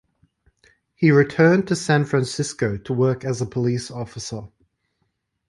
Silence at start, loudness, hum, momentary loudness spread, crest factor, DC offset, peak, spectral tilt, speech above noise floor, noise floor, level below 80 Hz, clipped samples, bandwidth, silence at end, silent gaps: 1 s; -21 LUFS; none; 15 LU; 18 dB; under 0.1%; -4 dBFS; -6 dB/octave; 53 dB; -73 dBFS; -54 dBFS; under 0.1%; 11.5 kHz; 1 s; none